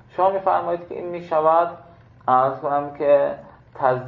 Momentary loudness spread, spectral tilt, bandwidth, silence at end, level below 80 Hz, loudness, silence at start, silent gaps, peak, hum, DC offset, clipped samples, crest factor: 11 LU; -9 dB/octave; 4.6 kHz; 0 s; -60 dBFS; -21 LUFS; 0.15 s; none; -4 dBFS; none; under 0.1%; under 0.1%; 18 dB